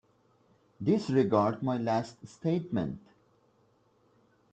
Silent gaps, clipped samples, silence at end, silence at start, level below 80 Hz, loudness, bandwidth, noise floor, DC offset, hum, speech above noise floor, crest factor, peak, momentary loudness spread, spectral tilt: none; under 0.1%; 1.55 s; 0.8 s; -66 dBFS; -30 LUFS; 9 kHz; -68 dBFS; under 0.1%; none; 39 dB; 22 dB; -12 dBFS; 11 LU; -8 dB/octave